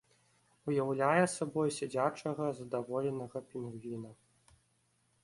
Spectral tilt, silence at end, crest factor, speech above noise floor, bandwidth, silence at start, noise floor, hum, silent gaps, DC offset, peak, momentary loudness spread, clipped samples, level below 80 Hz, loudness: -5.5 dB/octave; 1.1 s; 20 dB; 40 dB; 11.5 kHz; 0.65 s; -75 dBFS; none; none; under 0.1%; -16 dBFS; 14 LU; under 0.1%; -74 dBFS; -35 LUFS